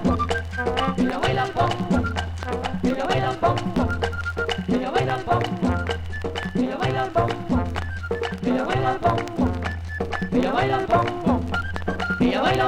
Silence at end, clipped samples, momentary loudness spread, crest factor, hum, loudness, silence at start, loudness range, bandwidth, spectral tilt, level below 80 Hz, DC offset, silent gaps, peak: 0 s; under 0.1%; 7 LU; 14 dB; none; -24 LUFS; 0 s; 2 LU; 13 kHz; -6.5 dB/octave; -36 dBFS; under 0.1%; none; -8 dBFS